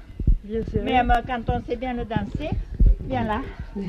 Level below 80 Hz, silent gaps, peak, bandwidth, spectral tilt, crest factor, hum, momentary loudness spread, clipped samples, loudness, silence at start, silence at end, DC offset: -26 dBFS; none; -8 dBFS; 6 kHz; -8 dB/octave; 16 dB; none; 8 LU; under 0.1%; -25 LUFS; 0 s; 0 s; under 0.1%